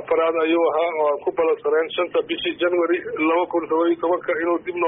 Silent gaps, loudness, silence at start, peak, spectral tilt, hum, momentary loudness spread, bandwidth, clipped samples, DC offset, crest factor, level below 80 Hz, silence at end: none; -21 LUFS; 0 s; -10 dBFS; -1.5 dB/octave; none; 4 LU; 3.8 kHz; under 0.1%; under 0.1%; 10 dB; -64 dBFS; 0 s